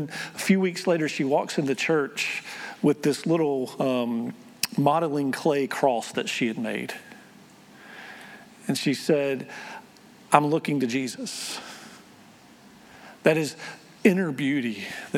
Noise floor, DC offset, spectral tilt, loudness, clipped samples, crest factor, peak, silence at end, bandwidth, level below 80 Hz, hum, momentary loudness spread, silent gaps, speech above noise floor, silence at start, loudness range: -51 dBFS; under 0.1%; -5 dB/octave; -25 LUFS; under 0.1%; 26 dB; 0 dBFS; 0 s; 19 kHz; -76 dBFS; none; 18 LU; none; 26 dB; 0 s; 5 LU